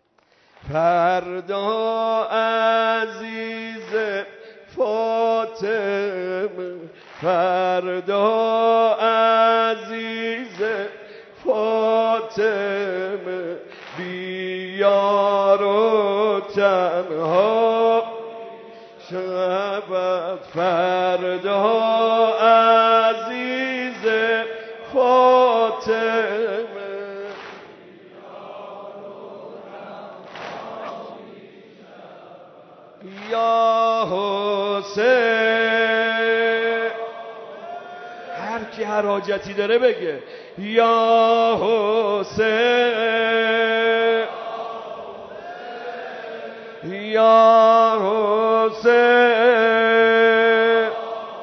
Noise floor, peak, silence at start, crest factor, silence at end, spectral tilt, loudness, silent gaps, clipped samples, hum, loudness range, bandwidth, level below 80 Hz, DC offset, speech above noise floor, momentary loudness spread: -59 dBFS; -2 dBFS; 0.65 s; 16 dB; 0 s; -5 dB/octave; -19 LUFS; none; under 0.1%; none; 11 LU; 6.4 kHz; -66 dBFS; under 0.1%; 41 dB; 20 LU